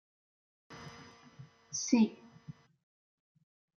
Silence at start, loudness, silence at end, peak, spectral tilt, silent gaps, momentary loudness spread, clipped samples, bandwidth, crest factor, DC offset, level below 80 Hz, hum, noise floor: 0.7 s; -32 LUFS; 1.3 s; -16 dBFS; -4 dB/octave; none; 26 LU; under 0.1%; 7.2 kHz; 24 dB; under 0.1%; -78 dBFS; none; -57 dBFS